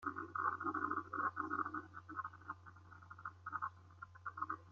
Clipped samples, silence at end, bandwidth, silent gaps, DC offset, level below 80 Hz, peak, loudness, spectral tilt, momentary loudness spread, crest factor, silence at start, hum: under 0.1%; 0 s; 7.4 kHz; none; under 0.1%; -80 dBFS; -24 dBFS; -44 LUFS; -5.5 dB/octave; 16 LU; 22 dB; 0 s; none